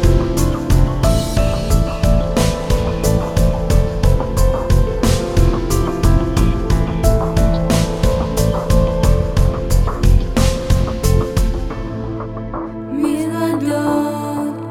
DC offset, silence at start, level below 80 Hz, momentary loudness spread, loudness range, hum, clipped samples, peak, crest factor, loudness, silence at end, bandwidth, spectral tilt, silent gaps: 0.3%; 0 s; -18 dBFS; 6 LU; 3 LU; none; under 0.1%; 0 dBFS; 14 dB; -17 LUFS; 0 s; 16 kHz; -6.5 dB/octave; none